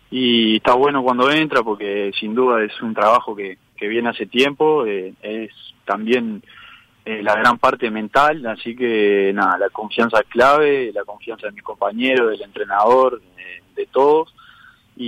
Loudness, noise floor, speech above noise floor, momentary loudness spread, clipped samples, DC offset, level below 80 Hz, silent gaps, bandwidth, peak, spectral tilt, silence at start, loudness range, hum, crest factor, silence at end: -17 LUFS; -48 dBFS; 31 dB; 15 LU; under 0.1%; under 0.1%; -56 dBFS; none; 13.5 kHz; -4 dBFS; -5 dB/octave; 0.1 s; 4 LU; none; 14 dB; 0 s